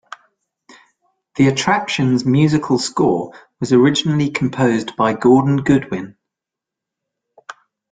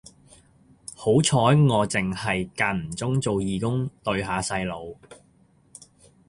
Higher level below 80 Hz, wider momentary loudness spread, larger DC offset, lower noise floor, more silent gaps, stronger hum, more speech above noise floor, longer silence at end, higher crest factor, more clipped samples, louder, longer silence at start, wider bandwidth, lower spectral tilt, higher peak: about the same, -54 dBFS vs -50 dBFS; about the same, 14 LU vs 13 LU; neither; first, -85 dBFS vs -59 dBFS; neither; neither; first, 70 dB vs 36 dB; second, 0.4 s vs 1.15 s; about the same, 16 dB vs 20 dB; neither; first, -16 LUFS vs -24 LUFS; first, 1.35 s vs 0.9 s; second, 9.4 kHz vs 11.5 kHz; about the same, -6 dB/octave vs -5.5 dB/octave; first, -2 dBFS vs -6 dBFS